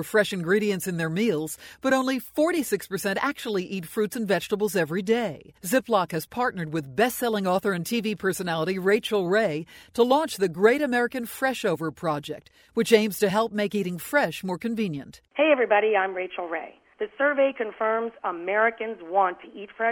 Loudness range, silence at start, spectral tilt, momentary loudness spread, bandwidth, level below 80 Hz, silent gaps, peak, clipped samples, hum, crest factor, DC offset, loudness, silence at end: 2 LU; 0 s; -5 dB/octave; 10 LU; 17.5 kHz; -64 dBFS; none; -4 dBFS; under 0.1%; none; 20 dB; under 0.1%; -25 LUFS; 0 s